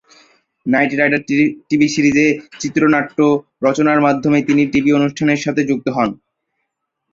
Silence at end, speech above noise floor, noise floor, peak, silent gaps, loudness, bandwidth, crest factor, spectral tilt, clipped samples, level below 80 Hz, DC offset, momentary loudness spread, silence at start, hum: 0.95 s; 60 dB; -74 dBFS; -2 dBFS; none; -15 LUFS; 7.6 kHz; 14 dB; -5.5 dB/octave; under 0.1%; -54 dBFS; under 0.1%; 5 LU; 0.65 s; none